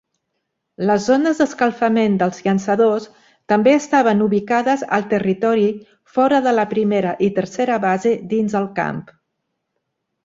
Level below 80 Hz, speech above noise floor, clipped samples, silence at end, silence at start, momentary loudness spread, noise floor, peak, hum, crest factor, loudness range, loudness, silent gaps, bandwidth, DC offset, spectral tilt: -60 dBFS; 58 dB; under 0.1%; 1.25 s; 0.8 s; 6 LU; -75 dBFS; -2 dBFS; none; 16 dB; 3 LU; -18 LUFS; none; 7.8 kHz; under 0.1%; -6 dB/octave